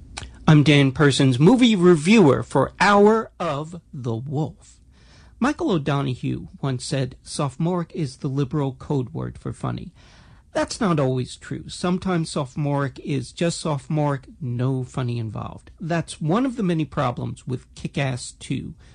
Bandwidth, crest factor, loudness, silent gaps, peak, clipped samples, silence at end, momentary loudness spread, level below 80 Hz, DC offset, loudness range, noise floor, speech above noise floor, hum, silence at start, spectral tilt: 10.5 kHz; 18 dB; -22 LUFS; none; -4 dBFS; under 0.1%; 0.2 s; 16 LU; -48 dBFS; under 0.1%; 9 LU; -50 dBFS; 28 dB; none; 0 s; -6 dB/octave